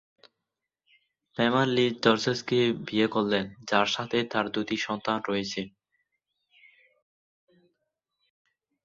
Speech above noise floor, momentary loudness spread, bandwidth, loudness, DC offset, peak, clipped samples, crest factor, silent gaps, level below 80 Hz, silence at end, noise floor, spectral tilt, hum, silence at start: 60 dB; 7 LU; 7.8 kHz; -27 LUFS; under 0.1%; -6 dBFS; under 0.1%; 24 dB; none; -66 dBFS; 3.15 s; -86 dBFS; -5 dB/octave; none; 1.4 s